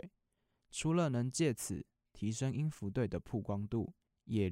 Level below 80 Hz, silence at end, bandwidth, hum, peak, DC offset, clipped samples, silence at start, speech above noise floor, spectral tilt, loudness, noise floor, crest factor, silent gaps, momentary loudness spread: -64 dBFS; 0 s; 16 kHz; none; -20 dBFS; under 0.1%; under 0.1%; 0.05 s; 46 dB; -6 dB/octave; -38 LUFS; -82 dBFS; 18 dB; none; 12 LU